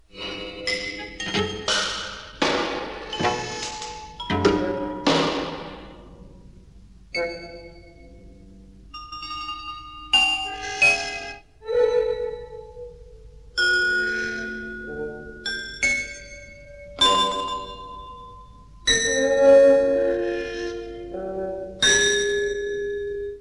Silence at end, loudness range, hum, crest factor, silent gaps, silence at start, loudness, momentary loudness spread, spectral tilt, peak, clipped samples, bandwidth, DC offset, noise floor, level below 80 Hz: 0 s; 9 LU; none; 20 dB; none; 0.15 s; -22 LUFS; 21 LU; -2.5 dB/octave; -6 dBFS; under 0.1%; 11.5 kHz; 0.1%; -48 dBFS; -48 dBFS